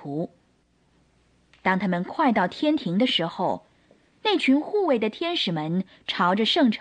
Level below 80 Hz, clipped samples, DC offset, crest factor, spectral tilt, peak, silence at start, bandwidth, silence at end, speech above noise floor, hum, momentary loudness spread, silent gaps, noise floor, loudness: -66 dBFS; under 0.1%; under 0.1%; 16 dB; -6 dB/octave; -8 dBFS; 0 s; 9.6 kHz; 0 s; 41 dB; none; 9 LU; none; -64 dBFS; -24 LUFS